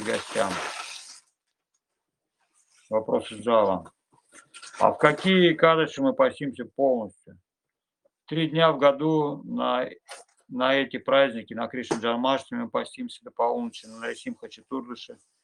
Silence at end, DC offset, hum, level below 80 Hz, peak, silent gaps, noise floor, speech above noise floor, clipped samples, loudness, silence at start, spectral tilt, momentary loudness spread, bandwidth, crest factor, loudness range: 0.3 s; under 0.1%; none; -72 dBFS; -2 dBFS; none; -87 dBFS; 62 dB; under 0.1%; -25 LUFS; 0 s; -5 dB/octave; 18 LU; 11.5 kHz; 24 dB; 7 LU